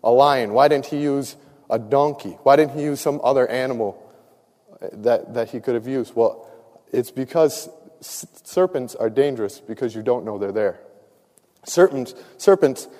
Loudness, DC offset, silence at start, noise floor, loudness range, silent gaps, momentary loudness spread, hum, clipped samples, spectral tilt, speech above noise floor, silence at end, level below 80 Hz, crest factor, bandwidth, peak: -20 LUFS; under 0.1%; 0.05 s; -59 dBFS; 5 LU; none; 17 LU; none; under 0.1%; -5.5 dB/octave; 39 dB; 0.1 s; -68 dBFS; 20 dB; 15.5 kHz; -2 dBFS